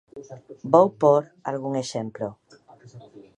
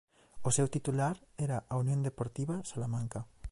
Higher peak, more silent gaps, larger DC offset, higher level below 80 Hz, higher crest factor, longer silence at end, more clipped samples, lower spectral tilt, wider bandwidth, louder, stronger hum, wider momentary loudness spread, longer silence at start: first, -2 dBFS vs -18 dBFS; neither; neither; second, -70 dBFS vs -56 dBFS; first, 22 dB vs 16 dB; first, 0.15 s vs 0 s; neither; about the same, -6.5 dB/octave vs -6 dB/octave; about the same, 10.5 kHz vs 11.5 kHz; first, -23 LUFS vs -35 LUFS; neither; first, 23 LU vs 7 LU; about the same, 0.15 s vs 0.05 s